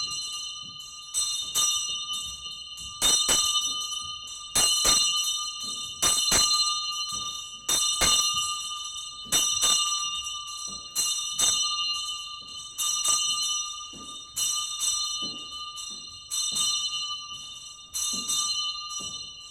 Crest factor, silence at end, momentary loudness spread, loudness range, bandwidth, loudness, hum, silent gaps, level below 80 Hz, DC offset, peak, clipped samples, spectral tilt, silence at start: 20 dB; 0 s; 15 LU; 5 LU; over 20 kHz; -25 LUFS; none; none; -54 dBFS; under 0.1%; -10 dBFS; under 0.1%; 1.5 dB/octave; 0 s